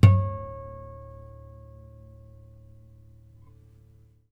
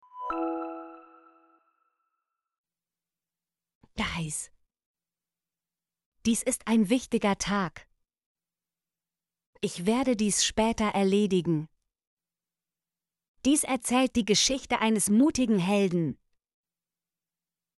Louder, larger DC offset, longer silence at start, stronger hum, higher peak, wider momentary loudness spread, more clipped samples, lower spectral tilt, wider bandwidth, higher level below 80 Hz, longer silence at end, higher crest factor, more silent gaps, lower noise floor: about the same, -28 LUFS vs -27 LUFS; neither; about the same, 0.05 s vs 0.15 s; neither; first, -2 dBFS vs -12 dBFS; first, 24 LU vs 12 LU; neither; first, -8.5 dB/octave vs -4 dB/octave; second, 5.6 kHz vs 12 kHz; first, -46 dBFS vs -56 dBFS; first, 3.55 s vs 1.65 s; first, 24 dB vs 18 dB; second, none vs 2.58-2.64 s, 3.75-3.81 s, 4.86-4.94 s, 6.06-6.12 s, 8.26-8.35 s, 9.46-9.53 s, 12.07-12.17 s, 13.28-13.35 s; second, -56 dBFS vs under -90 dBFS